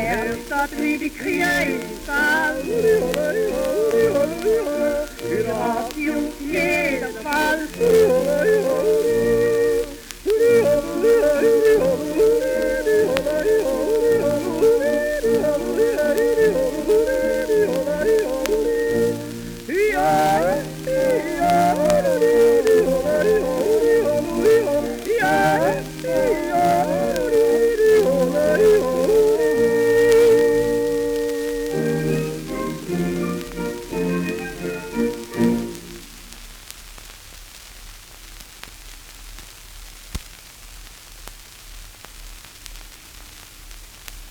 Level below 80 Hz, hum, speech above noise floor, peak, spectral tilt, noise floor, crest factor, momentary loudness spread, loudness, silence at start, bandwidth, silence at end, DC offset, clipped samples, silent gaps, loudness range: -42 dBFS; none; 21 dB; 0 dBFS; -5 dB/octave; -41 dBFS; 20 dB; 23 LU; -19 LUFS; 0 s; over 20 kHz; 0 s; under 0.1%; under 0.1%; none; 21 LU